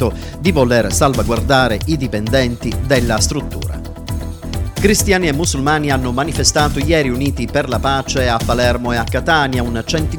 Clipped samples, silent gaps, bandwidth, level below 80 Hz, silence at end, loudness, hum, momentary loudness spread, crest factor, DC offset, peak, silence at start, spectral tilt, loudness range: under 0.1%; none; over 20 kHz; -26 dBFS; 0 s; -16 LUFS; none; 10 LU; 16 dB; under 0.1%; 0 dBFS; 0 s; -4.5 dB/octave; 2 LU